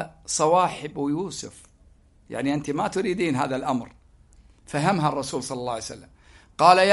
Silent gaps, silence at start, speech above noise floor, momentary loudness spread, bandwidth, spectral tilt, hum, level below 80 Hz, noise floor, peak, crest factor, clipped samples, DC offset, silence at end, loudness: none; 0 s; 33 dB; 16 LU; 11.5 kHz; -4.5 dB/octave; none; -56 dBFS; -56 dBFS; -2 dBFS; 22 dB; under 0.1%; under 0.1%; 0 s; -24 LUFS